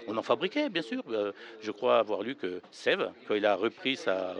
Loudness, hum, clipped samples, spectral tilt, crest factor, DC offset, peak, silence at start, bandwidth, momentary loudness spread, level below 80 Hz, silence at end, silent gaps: -30 LUFS; none; under 0.1%; -4.5 dB/octave; 18 dB; under 0.1%; -12 dBFS; 0 s; 10 kHz; 9 LU; -86 dBFS; 0 s; none